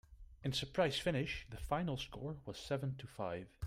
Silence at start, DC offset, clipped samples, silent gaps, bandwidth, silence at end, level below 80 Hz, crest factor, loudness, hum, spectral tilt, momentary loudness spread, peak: 0.1 s; under 0.1%; under 0.1%; none; 15.5 kHz; 0 s; -56 dBFS; 18 dB; -40 LUFS; none; -5.5 dB/octave; 10 LU; -22 dBFS